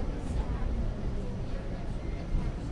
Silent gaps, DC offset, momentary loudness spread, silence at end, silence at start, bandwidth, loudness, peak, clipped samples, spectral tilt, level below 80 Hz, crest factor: none; under 0.1%; 4 LU; 0 s; 0 s; 10 kHz; -36 LUFS; -18 dBFS; under 0.1%; -7.5 dB/octave; -34 dBFS; 14 dB